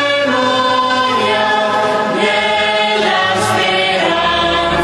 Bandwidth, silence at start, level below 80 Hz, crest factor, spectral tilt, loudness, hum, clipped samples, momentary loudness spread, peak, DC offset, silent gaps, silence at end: 13 kHz; 0 s; -42 dBFS; 14 dB; -3.5 dB/octave; -13 LUFS; none; under 0.1%; 1 LU; 0 dBFS; under 0.1%; none; 0 s